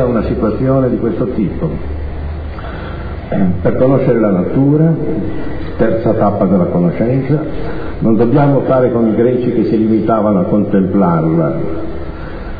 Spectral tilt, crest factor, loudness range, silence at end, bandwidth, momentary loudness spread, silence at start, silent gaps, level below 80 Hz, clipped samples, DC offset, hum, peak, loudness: -12.5 dB/octave; 12 dB; 5 LU; 0 s; 5 kHz; 13 LU; 0 s; none; -28 dBFS; under 0.1%; under 0.1%; none; 0 dBFS; -13 LUFS